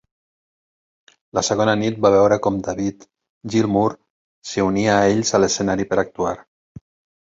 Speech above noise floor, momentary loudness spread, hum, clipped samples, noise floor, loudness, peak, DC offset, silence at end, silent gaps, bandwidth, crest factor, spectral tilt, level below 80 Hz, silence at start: over 72 dB; 11 LU; none; under 0.1%; under -90 dBFS; -19 LUFS; -2 dBFS; under 0.1%; 0.8 s; 3.29-3.41 s, 4.10-4.42 s; 8 kHz; 18 dB; -4.5 dB/octave; -50 dBFS; 1.35 s